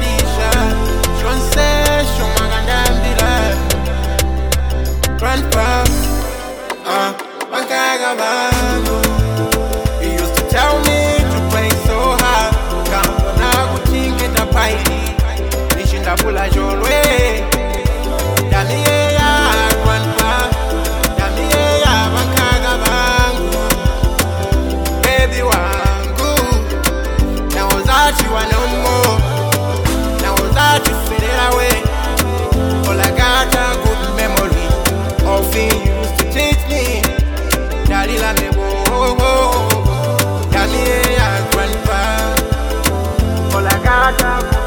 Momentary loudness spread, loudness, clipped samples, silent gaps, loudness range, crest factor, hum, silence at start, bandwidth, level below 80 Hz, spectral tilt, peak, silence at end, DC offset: 5 LU; -14 LUFS; under 0.1%; none; 2 LU; 14 dB; none; 0 s; over 20 kHz; -18 dBFS; -4 dB/octave; 0 dBFS; 0 s; under 0.1%